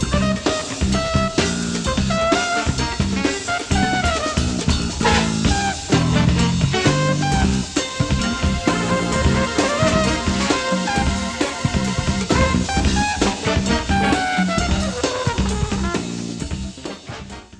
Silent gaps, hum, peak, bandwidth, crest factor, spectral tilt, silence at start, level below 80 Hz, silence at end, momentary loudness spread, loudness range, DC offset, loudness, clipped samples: none; none; -2 dBFS; 11.5 kHz; 16 dB; -4.5 dB/octave; 0 s; -28 dBFS; 0.05 s; 5 LU; 2 LU; under 0.1%; -19 LUFS; under 0.1%